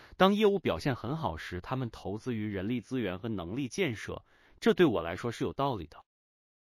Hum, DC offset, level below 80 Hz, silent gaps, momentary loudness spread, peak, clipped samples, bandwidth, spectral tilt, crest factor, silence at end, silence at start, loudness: none; under 0.1%; -58 dBFS; none; 13 LU; -10 dBFS; under 0.1%; 15.5 kHz; -6.5 dB/octave; 22 dB; 0.7 s; 0 s; -32 LUFS